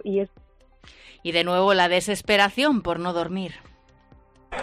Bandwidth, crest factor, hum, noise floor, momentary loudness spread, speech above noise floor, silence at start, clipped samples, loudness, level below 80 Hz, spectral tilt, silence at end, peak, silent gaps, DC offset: 15 kHz; 18 dB; none; -54 dBFS; 16 LU; 32 dB; 0.05 s; under 0.1%; -22 LUFS; -52 dBFS; -4 dB/octave; 0 s; -6 dBFS; none; under 0.1%